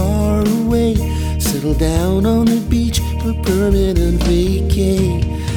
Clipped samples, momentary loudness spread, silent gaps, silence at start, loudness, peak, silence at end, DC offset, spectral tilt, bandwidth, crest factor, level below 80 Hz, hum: under 0.1%; 4 LU; none; 0 s; -16 LUFS; -2 dBFS; 0 s; under 0.1%; -6.5 dB/octave; 19 kHz; 12 dB; -20 dBFS; none